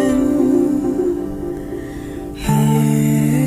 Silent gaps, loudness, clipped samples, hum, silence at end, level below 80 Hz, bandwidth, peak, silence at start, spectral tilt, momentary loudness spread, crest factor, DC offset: none; -17 LUFS; under 0.1%; none; 0 s; -36 dBFS; 16 kHz; -4 dBFS; 0 s; -7 dB/octave; 13 LU; 12 dB; under 0.1%